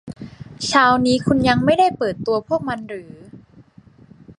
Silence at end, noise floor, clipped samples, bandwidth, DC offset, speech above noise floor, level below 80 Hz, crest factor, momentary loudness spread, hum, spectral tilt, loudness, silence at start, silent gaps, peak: 0.05 s; -48 dBFS; under 0.1%; 11.5 kHz; under 0.1%; 31 dB; -48 dBFS; 18 dB; 20 LU; none; -5 dB/octave; -18 LUFS; 0.05 s; none; -2 dBFS